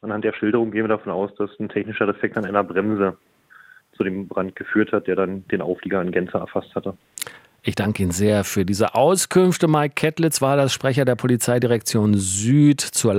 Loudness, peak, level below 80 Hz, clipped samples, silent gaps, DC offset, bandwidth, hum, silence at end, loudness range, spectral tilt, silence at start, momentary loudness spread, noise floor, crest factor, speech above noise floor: -20 LUFS; -2 dBFS; -60 dBFS; under 0.1%; none; under 0.1%; 16.5 kHz; none; 0 s; 6 LU; -5 dB/octave; 0.05 s; 10 LU; -49 dBFS; 18 dB; 29 dB